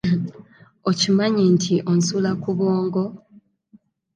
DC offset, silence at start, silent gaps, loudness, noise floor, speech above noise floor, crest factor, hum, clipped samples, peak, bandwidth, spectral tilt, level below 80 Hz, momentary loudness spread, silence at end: under 0.1%; 0.05 s; none; -20 LUFS; -55 dBFS; 36 dB; 16 dB; none; under 0.1%; -6 dBFS; 9.4 kHz; -5.5 dB/octave; -60 dBFS; 9 LU; 1 s